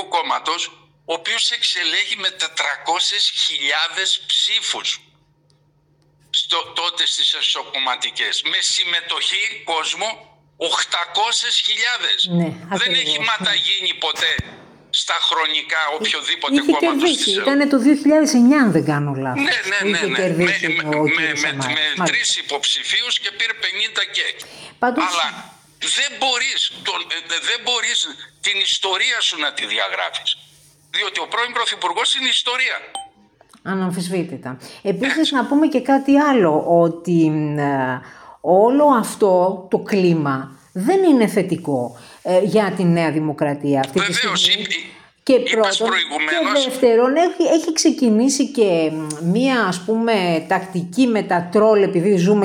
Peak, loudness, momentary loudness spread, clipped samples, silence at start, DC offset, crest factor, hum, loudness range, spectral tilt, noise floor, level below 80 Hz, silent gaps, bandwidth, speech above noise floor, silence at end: -2 dBFS; -17 LUFS; 8 LU; under 0.1%; 0 s; under 0.1%; 16 dB; none; 4 LU; -3.5 dB/octave; -59 dBFS; -62 dBFS; none; 16.5 kHz; 40 dB; 0 s